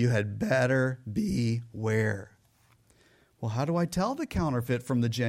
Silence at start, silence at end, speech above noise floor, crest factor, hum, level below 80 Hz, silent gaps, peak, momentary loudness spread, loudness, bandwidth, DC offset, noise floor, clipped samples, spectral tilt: 0 s; 0 s; 36 dB; 16 dB; none; -52 dBFS; none; -14 dBFS; 6 LU; -29 LUFS; 15.5 kHz; under 0.1%; -64 dBFS; under 0.1%; -6.5 dB/octave